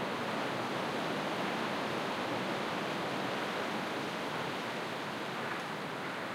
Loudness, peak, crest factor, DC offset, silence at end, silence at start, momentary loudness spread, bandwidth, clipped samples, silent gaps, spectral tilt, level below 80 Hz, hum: -36 LUFS; -22 dBFS; 14 dB; under 0.1%; 0 s; 0 s; 3 LU; 16 kHz; under 0.1%; none; -4.5 dB/octave; -76 dBFS; none